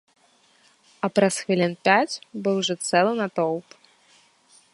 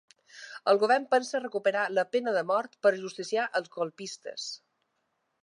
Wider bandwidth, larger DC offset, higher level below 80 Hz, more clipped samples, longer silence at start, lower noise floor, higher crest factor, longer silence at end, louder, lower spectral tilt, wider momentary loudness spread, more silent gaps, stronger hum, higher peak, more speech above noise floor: about the same, 11.5 kHz vs 11 kHz; neither; first, -74 dBFS vs -88 dBFS; neither; first, 1.05 s vs 0.35 s; second, -61 dBFS vs -78 dBFS; about the same, 22 dB vs 20 dB; first, 1.1 s vs 0.85 s; first, -23 LUFS vs -29 LUFS; about the same, -4 dB/octave vs -3.5 dB/octave; second, 8 LU vs 14 LU; neither; neither; first, -2 dBFS vs -10 dBFS; second, 38 dB vs 50 dB